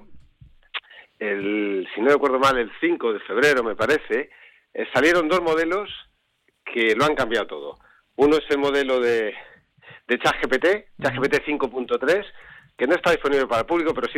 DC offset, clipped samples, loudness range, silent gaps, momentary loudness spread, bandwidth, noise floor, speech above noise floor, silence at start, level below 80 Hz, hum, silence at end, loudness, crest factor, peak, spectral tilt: under 0.1%; under 0.1%; 2 LU; none; 15 LU; 16 kHz; -68 dBFS; 47 dB; 0.05 s; -52 dBFS; none; 0 s; -21 LUFS; 16 dB; -6 dBFS; -4.5 dB/octave